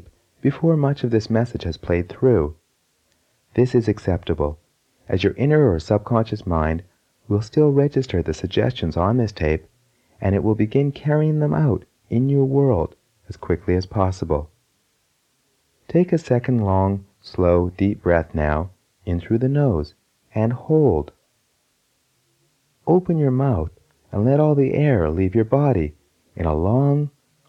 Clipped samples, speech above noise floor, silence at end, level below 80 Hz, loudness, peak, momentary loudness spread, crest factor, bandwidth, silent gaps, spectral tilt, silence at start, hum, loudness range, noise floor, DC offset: under 0.1%; 48 dB; 0.4 s; -38 dBFS; -20 LUFS; -2 dBFS; 10 LU; 18 dB; 8.2 kHz; none; -9 dB/octave; 0.45 s; none; 4 LU; -67 dBFS; under 0.1%